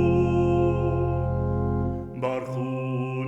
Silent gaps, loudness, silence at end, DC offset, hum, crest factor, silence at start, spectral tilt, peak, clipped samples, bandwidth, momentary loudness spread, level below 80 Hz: none; -25 LUFS; 0 s; under 0.1%; none; 12 dB; 0 s; -9.5 dB/octave; -12 dBFS; under 0.1%; 7.8 kHz; 8 LU; -38 dBFS